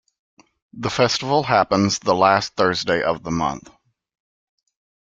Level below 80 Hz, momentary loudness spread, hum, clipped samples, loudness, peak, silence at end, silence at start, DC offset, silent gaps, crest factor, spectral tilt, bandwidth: -54 dBFS; 9 LU; none; under 0.1%; -19 LUFS; -2 dBFS; 1.5 s; 0.75 s; under 0.1%; none; 20 dB; -4.5 dB/octave; 9.4 kHz